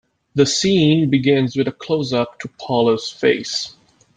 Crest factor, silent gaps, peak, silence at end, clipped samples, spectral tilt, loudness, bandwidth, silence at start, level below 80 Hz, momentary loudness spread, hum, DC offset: 16 dB; none; -2 dBFS; 0.45 s; under 0.1%; -5 dB/octave; -18 LUFS; 9.4 kHz; 0.35 s; -56 dBFS; 10 LU; none; under 0.1%